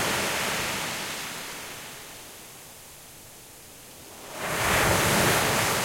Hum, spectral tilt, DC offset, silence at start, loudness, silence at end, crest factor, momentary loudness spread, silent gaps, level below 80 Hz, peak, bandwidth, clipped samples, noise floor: none; -2.5 dB/octave; under 0.1%; 0 s; -25 LUFS; 0 s; 20 dB; 23 LU; none; -48 dBFS; -8 dBFS; 16.5 kHz; under 0.1%; -47 dBFS